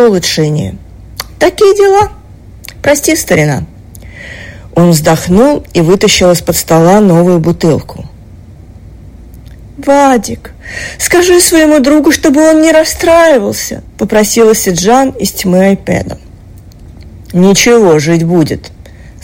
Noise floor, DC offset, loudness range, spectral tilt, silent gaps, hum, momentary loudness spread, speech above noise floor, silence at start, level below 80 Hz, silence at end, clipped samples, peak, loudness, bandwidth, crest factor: -32 dBFS; under 0.1%; 5 LU; -4.5 dB/octave; none; none; 16 LU; 25 dB; 0 s; -32 dBFS; 0.15 s; 0.3%; 0 dBFS; -8 LUFS; 17 kHz; 8 dB